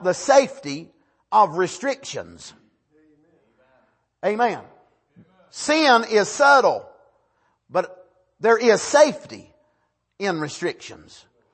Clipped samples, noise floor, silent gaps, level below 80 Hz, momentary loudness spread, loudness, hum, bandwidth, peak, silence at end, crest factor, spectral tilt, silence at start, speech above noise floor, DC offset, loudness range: under 0.1%; -70 dBFS; none; -68 dBFS; 20 LU; -19 LUFS; none; 8.8 kHz; -4 dBFS; 0.6 s; 20 dB; -3 dB/octave; 0 s; 51 dB; under 0.1%; 10 LU